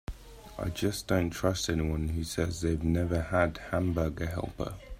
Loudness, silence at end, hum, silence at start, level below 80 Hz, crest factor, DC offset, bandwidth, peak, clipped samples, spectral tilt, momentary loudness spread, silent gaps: -31 LUFS; 0 s; none; 0.1 s; -44 dBFS; 20 dB; under 0.1%; 15.5 kHz; -12 dBFS; under 0.1%; -5.5 dB/octave; 9 LU; none